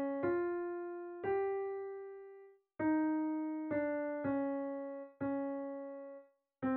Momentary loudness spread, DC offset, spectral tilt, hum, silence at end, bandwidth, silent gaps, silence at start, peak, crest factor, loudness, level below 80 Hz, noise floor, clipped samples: 15 LU; under 0.1%; -7.5 dB/octave; none; 0 s; 4.2 kHz; none; 0 s; -24 dBFS; 14 dB; -38 LUFS; -76 dBFS; -59 dBFS; under 0.1%